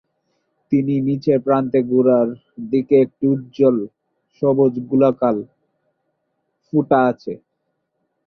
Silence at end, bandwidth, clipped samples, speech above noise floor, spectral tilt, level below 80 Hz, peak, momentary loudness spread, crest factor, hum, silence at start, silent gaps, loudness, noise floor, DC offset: 0.9 s; 6 kHz; under 0.1%; 56 dB; -10.5 dB/octave; -62 dBFS; -2 dBFS; 9 LU; 16 dB; none; 0.7 s; none; -18 LUFS; -73 dBFS; under 0.1%